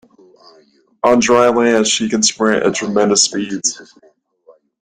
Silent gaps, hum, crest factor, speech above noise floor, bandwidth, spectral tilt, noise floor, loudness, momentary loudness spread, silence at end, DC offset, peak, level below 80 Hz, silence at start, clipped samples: none; none; 16 dB; 37 dB; 11 kHz; -2.5 dB/octave; -51 dBFS; -14 LUFS; 7 LU; 1 s; under 0.1%; 0 dBFS; -56 dBFS; 1.05 s; under 0.1%